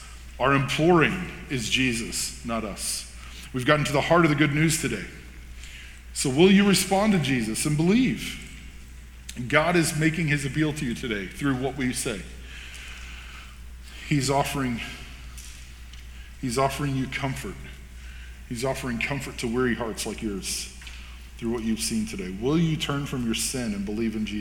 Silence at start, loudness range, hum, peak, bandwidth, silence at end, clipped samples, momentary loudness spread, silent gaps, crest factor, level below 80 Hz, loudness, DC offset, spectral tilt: 0 s; 8 LU; none; -2 dBFS; 19 kHz; 0 s; under 0.1%; 22 LU; none; 24 dB; -42 dBFS; -25 LUFS; under 0.1%; -4.5 dB/octave